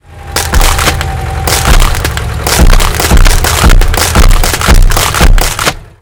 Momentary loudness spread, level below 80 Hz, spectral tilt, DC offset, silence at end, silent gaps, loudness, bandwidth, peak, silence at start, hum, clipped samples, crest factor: 6 LU; -8 dBFS; -3.5 dB/octave; under 0.1%; 0.15 s; none; -9 LUFS; 19 kHz; 0 dBFS; 0.1 s; none; 10%; 6 dB